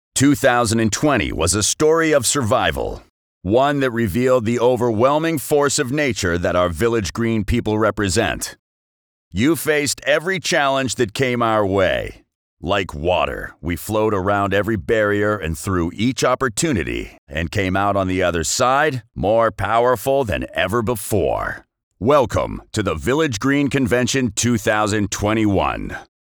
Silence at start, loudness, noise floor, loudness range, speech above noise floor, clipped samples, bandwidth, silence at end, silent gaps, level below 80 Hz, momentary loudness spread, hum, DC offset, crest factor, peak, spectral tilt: 0.15 s; -18 LUFS; under -90 dBFS; 3 LU; over 72 dB; under 0.1%; over 20 kHz; 0.3 s; 3.10-3.41 s, 8.59-9.31 s, 12.35-12.57 s, 17.18-17.27 s, 21.83-21.91 s; -40 dBFS; 8 LU; none; under 0.1%; 14 dB; -4 dBFS; -4.5 dB/octave